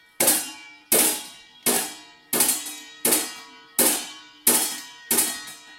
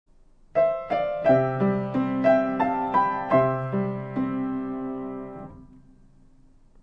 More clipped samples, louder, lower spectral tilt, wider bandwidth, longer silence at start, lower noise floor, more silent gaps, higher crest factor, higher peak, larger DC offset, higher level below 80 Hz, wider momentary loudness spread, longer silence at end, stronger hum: neither; first, -21 LUFS vs -24 LUFS; second, 0 dB/octave vs -9.5 dB/octave; first, 17 kHz vs 6 kHz; second, 0.2 s vs 0.55 s; second, -42 dBFS vs -54 dBFS; neither; about the same, 22 dB vs 18 dB; first, -2 dBFS vs -8 dBFS; neither; second, -70 dBFS vs -54 dBFS; first, 16 LU vs 12 LU; second, 0 s vs 1.05 s; neither